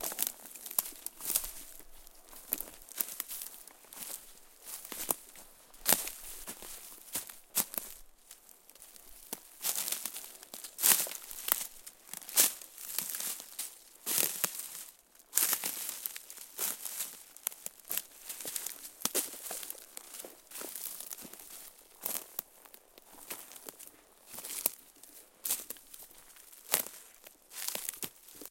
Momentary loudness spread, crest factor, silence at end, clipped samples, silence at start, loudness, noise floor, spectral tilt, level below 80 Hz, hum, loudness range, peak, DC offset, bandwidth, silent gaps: 23 LU; 36 dB; 0 s; under 0.1%; 0 s; -35 LUFS; -58 dBFS; 0.5 dB/octave; -66 dBFS; none; 10 LU; -4 dBFS; under 0.1%; 17 kHz; none